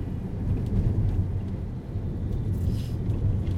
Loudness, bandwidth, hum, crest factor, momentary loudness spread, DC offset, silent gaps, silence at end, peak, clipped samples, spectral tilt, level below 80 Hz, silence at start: -29 LUFS; 7.4 kHz; none; 16 dB; 7 LU; under 0.1%; none; 0 s; -12 dBFS; under 0.1%; -9.5 dB/octave; -32 dBFS; 0 s